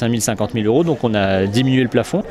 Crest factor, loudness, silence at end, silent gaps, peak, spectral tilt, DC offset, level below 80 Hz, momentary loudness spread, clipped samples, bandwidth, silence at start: 14 dB; -17 LUFS; 0 s; none; -2 dBFS; -5.5 dB/octave; under 0.1%; -46 dBFS; 3 LU; under 0.1%; 14.5 kHz; 0 s